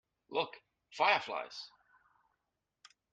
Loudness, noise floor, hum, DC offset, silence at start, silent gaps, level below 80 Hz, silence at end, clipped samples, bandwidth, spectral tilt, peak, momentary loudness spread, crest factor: -34 LUFS; -86 dBFS; none; under 0.1%; 0.3 s; none; -84 dBFS; 1.45 s; under 0.1%; 9.2 kHz; -2.5 dB/octave; -14 dBFS; 20 LU; 24 dB